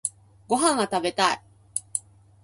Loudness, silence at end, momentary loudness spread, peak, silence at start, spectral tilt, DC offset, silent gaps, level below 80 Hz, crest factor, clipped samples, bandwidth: -25 LUFS; 0.45 s; 11 LU; -4 dBFS; 0.05 s; -2 dB/octave; under 0.1%; none; -64 dBFS; 22 dB; under 0.1%; 11.5 kHz